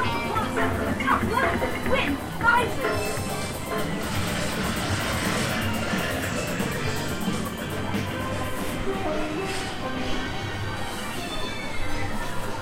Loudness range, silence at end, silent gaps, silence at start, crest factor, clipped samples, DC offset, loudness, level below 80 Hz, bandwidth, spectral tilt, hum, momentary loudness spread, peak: 5 LU; 0 s; none; 0 s; 18 dB; under 0.1%; under 0.1%; -27 LUFS; -38 dBFS; 16 kHz; -4.5 dB/octave; none; 7 LU; -8 dBFS